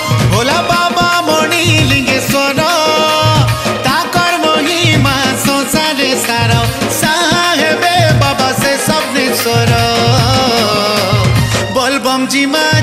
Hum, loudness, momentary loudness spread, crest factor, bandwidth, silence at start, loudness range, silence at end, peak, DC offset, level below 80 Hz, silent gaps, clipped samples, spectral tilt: none; -11 LUFS; 3 LU; 10 dB; 15.5 kHz; 0 s; 1 LU; 0 s; 0 dBFS; under 0.1%; -32 dBFS; none; under 0.1%; -4 dB/octave